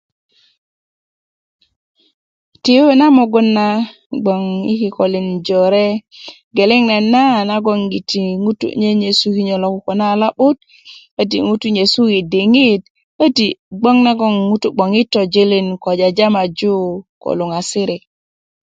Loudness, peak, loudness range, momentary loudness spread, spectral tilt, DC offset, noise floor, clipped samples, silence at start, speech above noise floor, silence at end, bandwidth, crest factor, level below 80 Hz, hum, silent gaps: -14 LUFS; 0 dBFS; 2 LU; 9 LU; -5.5 dB/octave; under 0.1%; under -90 dBFS; under 0.1%; 2.65 s; over 76 dB; 0.65 s; 9.2 kHz; 14 dB; -58 dBFS; none; 4.06-4.10 s, 6.44-6.51 s, 11.11-11.17 s, 12.90-12.95 s, 13.04-13.19 s, 13.59-13.71 s, 17.09-17.21 s